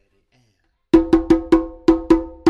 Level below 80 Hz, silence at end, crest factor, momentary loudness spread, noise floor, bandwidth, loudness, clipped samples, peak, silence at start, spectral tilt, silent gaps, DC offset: -34 dBFS; 0 s; 16 dB; 3 LU; -65 dBFS; 7.6 kHz; -17 LUFS; under 0.1%; -2 dBFS; 0.95 s; -7.5 dB/octave; none; under 0.1%